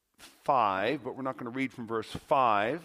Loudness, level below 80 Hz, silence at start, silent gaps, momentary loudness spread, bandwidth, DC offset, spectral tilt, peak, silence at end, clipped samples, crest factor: -30 LUFS; -66 dBFS; 0.2 s; none; 11 LU; 15.5 kHz; under 0.1%; -6 dB/octave; -12 dBFS; 0 s; under 0.1%; 18 dB